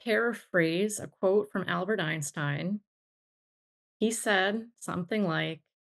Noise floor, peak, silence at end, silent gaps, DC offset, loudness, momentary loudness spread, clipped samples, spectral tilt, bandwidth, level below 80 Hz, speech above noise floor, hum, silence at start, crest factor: under -90 dBFS; -12 dBFS; 0.3 s; 2.87-4.00 s; under 0.1%; -30 LUFS; 10 LU; under 0.1%; -4.5 dB/octave; 12.5 kHz; -76 dBFS; over 61 dB; none; 0.05 s; 20 dB